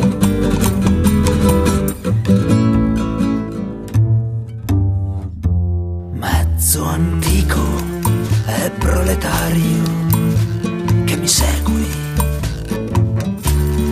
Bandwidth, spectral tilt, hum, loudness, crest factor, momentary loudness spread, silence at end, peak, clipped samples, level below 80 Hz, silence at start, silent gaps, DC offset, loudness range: 14 kHz; -5.5 dB/octave; none; -17 LUFS; 16 dB; 7 LU; 0 s; 0 dBFS; under 0.1%; -24 dBFS; 0 s; none; under 0.1%; 3 LU